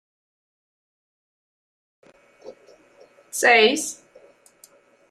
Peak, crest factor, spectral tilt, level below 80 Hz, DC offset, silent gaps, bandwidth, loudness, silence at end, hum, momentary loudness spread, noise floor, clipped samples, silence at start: -2 dBFS; 24 dB; -1 dB/octave; -76 dBFS; under 0.1%; none; 15.5 kHz; -18 LUFS; 1.2 s; none; 18 LU; -55 dBFS; under 0.1%; 2.45 s